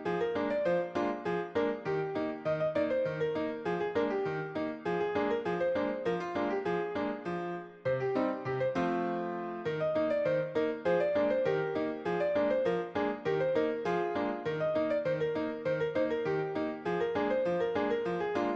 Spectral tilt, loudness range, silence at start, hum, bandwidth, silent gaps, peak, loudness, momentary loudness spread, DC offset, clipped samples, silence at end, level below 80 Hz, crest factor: -7.5 dB/octave; 2 LU; 0 s; none; 8 kHz; none; -18 dBFS; -32 LUFS; 5 LU; under 0.1%; under 0.1%; 0 s; -66 dBFS; 14 dB